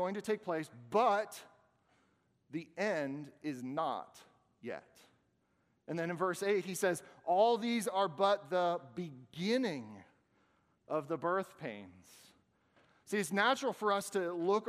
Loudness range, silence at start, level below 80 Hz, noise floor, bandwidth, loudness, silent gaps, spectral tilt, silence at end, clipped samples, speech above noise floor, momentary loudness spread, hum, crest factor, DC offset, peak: 8 LU; 0 s; -86 dBFS; -77 dBFS; 15.5 kHz; -35 LUFS; none; -4.5 dB/octave; 0 s; under 0.1%; 41 dB; 15 LU; none; 20 dB; under 0.1%; -18 dBFS